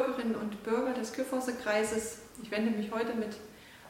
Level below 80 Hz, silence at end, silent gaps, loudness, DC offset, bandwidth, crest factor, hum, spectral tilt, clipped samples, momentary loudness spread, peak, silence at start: -66 dBFS; 0 s; none; -33 LUFS; under 0.1%; 16.5 kHz; 18 dB; none; -4.5 dB/octave; under 0.1%; 10 LU; -16 dBFS; 0 s